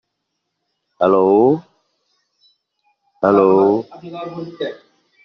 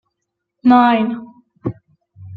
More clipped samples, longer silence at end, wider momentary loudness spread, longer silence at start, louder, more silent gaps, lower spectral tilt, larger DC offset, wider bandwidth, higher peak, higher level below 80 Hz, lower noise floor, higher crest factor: neither; first, 0.5 s vs 0 s; about the same, 17 LU vs 17 LU; first, 1 s vs 0.65 s; about the same, -15 LUFS vs -14 LUFS; neither; second, -7 dB/octave vs -8.5 dB/octave; neither; first, 5.8 kHz vs 4.8 kHz; about the same, -2 dBFS vs -2 dBFS; second, -64 dBFS vs -56 dBFS; about the same, -75 dBFS vs -77 dBFS; about the same, 16 dB vs 16 dB